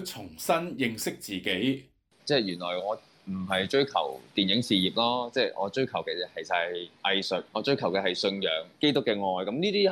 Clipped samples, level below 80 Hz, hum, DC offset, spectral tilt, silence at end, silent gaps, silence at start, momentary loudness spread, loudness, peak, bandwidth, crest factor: under 0.1%; -70 dBFS; none; under 0.1%; -4.5 dB/octave; 0 s; none; 0 s; 8 LU; -28 LUFS; -12 dBFS; over 20 kHz; 16 dB